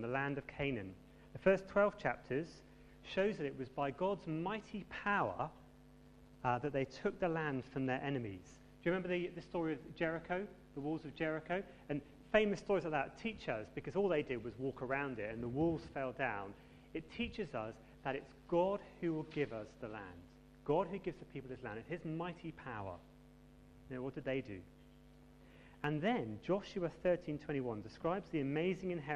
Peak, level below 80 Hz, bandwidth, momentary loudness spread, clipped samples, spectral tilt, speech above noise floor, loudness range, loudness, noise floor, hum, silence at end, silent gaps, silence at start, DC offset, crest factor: -16 dBFS; -64 dBFS; 11 kHz; 13 LU; under 0.1%; -7 dB/octave; 22 dB; 5 LU; -40 LUFS; -61 dBFS; none; 0 s; none; 0 s; under 0.1%; 24 dB